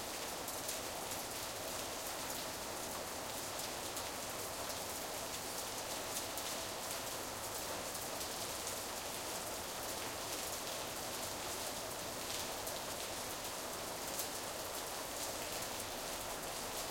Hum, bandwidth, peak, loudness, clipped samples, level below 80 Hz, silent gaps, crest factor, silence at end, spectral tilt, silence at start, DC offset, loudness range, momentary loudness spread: none; 17 kHz; -22 dBFS; -41 LUFS; under 0.1%; -64 dBFS; none; 22 dB; 0 s; -1.5 dB/octave; 0 s; under 0.1%; 1 LU; 2 LU